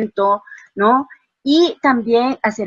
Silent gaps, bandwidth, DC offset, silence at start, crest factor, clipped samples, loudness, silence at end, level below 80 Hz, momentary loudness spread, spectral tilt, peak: none; 7.6 kHz; under 0.1%; 0 s; 16 dB; under 0.1%; -16 LUFS; 0 s; -62 dBFS; 11 LU; -5 dB/octave; 0 dBFS